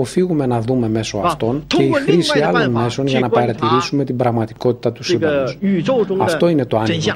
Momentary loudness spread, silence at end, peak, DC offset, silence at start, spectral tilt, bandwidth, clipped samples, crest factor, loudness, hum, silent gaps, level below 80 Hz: 4 LU; 0 s; 0 dBFS; under 0.1%; 0 s; -6 dB/octave; 14 kHz; under 0.1%; 16 dB; -17 LUFS; none; none; -46 dBFS